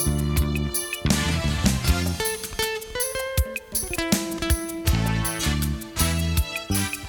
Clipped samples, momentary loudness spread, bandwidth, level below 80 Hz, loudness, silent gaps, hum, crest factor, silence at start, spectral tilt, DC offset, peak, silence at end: under 0.1%; 4 LU; over 20 kHz; -30 dBFS; -24 LUFS; none; none; 22 dB; 0 s; -4 dB/octave; under 0.1%; -2 dBFS; 0 s